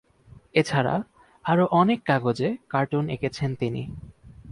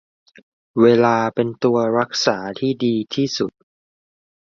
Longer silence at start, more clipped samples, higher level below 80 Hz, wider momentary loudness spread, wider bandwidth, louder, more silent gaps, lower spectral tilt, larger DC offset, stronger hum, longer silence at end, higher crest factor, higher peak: second, 0.35 s vs 0.75 s; neither; first, -54 dBFS vs -62 dBFS; first, 13 LU vs 9 LU; first, 11.5 kHz vs 7.4 kHz; second, -25 LUFS vs -19 LUFS; neither; first, -7 dB/octave vs -5.5 dB/octave; neither; neither; second, 0 s vs 1.1 s; about the same, 18 dB vs 18 dB; second, -8 dBFS vs -2 dBFS